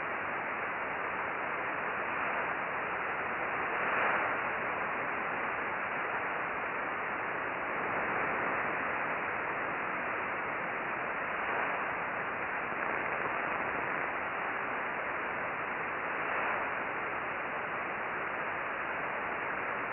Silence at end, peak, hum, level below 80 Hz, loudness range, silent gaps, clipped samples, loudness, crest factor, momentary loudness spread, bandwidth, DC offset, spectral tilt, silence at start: 0 s; -18 dBFS; none; -66 dBFS; 2 LU; none; under 0.1%; -34 LUFS; 18 dB; 3 LU; 5.2 kHz; under 0.1%; -8 dB/octave; 0 s